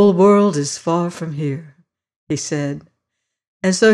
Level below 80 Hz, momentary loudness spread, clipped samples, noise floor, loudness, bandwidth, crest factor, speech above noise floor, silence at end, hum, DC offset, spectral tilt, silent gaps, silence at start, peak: -60 dBFS; 14 LU; under 0.1%; -78 dBFS; -18 LUFS; 11.5 kHz; 14 dB; 62 dB; 0 s; none; under 0.1%; -5.5 dB/octave; 2.16-2.27 s, 3.47-3.60 s; 0 s; -4 dBFS